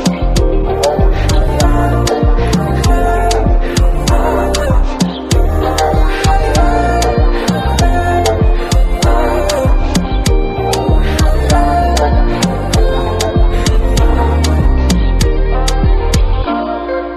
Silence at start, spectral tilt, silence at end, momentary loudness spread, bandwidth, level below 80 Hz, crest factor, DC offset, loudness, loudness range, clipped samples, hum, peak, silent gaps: 0 s; -5.5 dB/octave; 0 s; 3 LU; 13.5 kHz; -12 dBFS; 10 dB; under 0.1%; -13 LUFS; 1 LU; under 0.1%; none; 0 dBFS; none